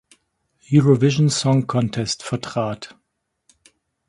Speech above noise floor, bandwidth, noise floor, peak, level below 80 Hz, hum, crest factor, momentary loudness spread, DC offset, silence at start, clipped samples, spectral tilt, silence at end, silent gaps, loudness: 56 dB; 11 kHz; -75 dBFS; -2 dBFS; -56 dBFS; none; 18 dB; 11 LU; under 0.1%; 0.7 s; under 0.1%; -6 dB/octave; 1.25 s; none; -19 LUFS